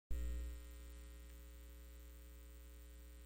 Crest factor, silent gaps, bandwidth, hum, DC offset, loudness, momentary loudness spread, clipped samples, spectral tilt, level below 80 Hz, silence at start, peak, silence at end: 20 dB; none; 16.5 kHz; none; under 0.1%; -54 LUFS; 12 LU; under 0.1%; -5.5 dB/octave; -50 dBFS; 0.1 s; -30 dBFS; 0 s